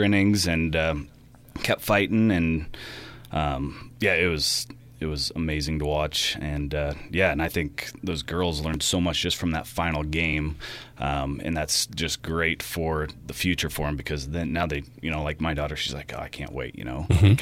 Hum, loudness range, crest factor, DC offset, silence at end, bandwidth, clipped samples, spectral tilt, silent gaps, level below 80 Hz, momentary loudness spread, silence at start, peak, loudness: none; 3 LU; 20 dB; under 0.1%; 0 s; 16 kHz; under 0.1%; -4.5 dB/octave; none; -38 dBFS; 12 LU; 0 s; -6 dBFS; -26 LUFS